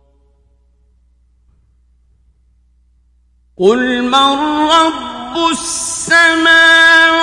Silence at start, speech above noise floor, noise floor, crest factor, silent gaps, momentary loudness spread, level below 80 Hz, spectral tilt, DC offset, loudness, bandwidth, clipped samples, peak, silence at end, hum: 3.6 s; 43 dB; -53 dBFS; 14 dB; none; 12 LU; -48 dBFS; -1.5 dB/octave; under 0.1%; -10 LUFS; 11.5 kHz; under 0.1%; 0 dBFS; 0 s; none